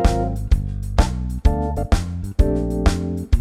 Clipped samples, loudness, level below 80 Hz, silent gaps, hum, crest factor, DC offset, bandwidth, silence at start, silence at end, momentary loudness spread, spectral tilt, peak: under 0.1%; -22 LUFS; -20 dBFS; none; none; 16 dB; under 0.1%; 13.5 kHz; 0 s; 0 s; 3 LU; -7 dB/octave; -4 dBFS